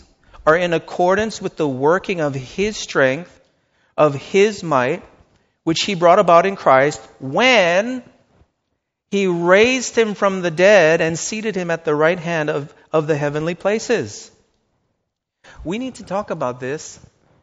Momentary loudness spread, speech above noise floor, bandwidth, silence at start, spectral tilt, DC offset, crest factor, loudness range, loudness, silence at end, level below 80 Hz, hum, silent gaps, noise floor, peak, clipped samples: 14 LU; 58 dB; 8 kHz; 0.4 s; -3.5 dB/octave; under 0.1%; 18 dB; 8 LU; -17 LUFS; 0.5 s; -52 dBFS; none; none; -75 dBFS; 0 dBFS; under 0.1%